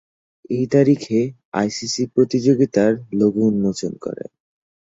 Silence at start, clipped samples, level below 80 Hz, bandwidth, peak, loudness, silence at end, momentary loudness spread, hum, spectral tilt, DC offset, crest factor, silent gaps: 0.5 s; under 0.1%; -58 dBFS; 8 kHz; -2 dBFS; -19 LUFS; 0.75 s; 11 LU; none; -6 dB/octave; under 0.1%; 16 dB; 1.45-1.52 s